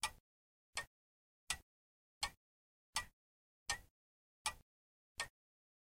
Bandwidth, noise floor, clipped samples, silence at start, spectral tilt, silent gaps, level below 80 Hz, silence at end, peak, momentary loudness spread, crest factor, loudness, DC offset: 16 kHz; under -90 dBFS; under 0.1%; 0 s; 0.5 dB/octave; 0.20-0.73 s, 0.87-1.47 s, 1.63-2.21 s, 2.37-2.93 s, 3.13-3.66 s, 3.90-4.45 s, 4.62-5.15 s; -68 dBFS; 0.65 s; -24 dBFS; 8 LU; 28 dB; -46 LUFS; under 0.1%